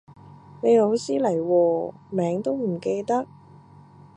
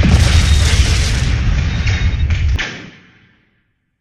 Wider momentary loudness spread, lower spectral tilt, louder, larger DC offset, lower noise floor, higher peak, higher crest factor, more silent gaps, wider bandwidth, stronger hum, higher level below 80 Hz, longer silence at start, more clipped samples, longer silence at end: about the same, 8 LU vs 7 LU; first, -7 dB/octave vs -4.5 dB/octave; second, -23 LUFS vs -15 LUFS; neither; second, -49 dBFS vs -63 dBFS; second, -8 dBFS vs 0 dBFS; about the same, 16 dB vs 14 dB; neither; second, 10 kHz vs 12.5 kHz; neither; second, -68 dBFS vs -16 dBFS; about the same, 0.1 s vs 0 s; neither; second, 0.9 s vs 1.1 s